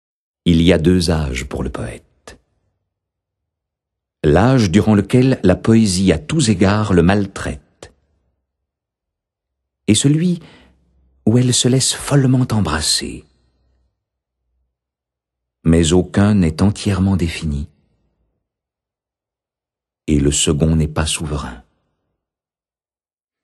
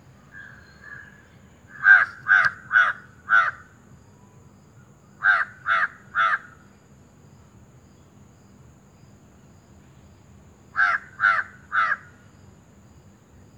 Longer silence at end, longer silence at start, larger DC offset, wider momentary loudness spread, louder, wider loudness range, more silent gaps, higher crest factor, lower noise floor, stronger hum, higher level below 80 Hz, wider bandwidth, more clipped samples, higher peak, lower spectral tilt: first, 1.85 s vs 1.6 s; about the same, 0.45 s vs 0.35 s; neither; second, 13 LU vs 26 LU; first, -15 LUFS vs -20 LUFS; about the same, 8 LU vs 10 LU; neither; about the same, 18 dB vs 22 dB; first, under -90 dBFS vs -52 dBFS; neither; first, -34 dBFS vs -62 dBFS; first, 12.5 kHz vs 9.4 kHz; neither; first, 0 dBFS vs -4 dBFS; first, -5.5 dB/octave vs -3 dB/octave